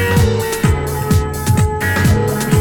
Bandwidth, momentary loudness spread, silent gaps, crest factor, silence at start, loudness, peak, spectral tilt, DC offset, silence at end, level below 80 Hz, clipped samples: 19.5 kHz; 3 LU; none; 12 dB; 0 s; -15 LUFS; -2 dBFS; -5.5 dB/octave; under 0.1%; 0 s; -26 dBFS; under 0.1%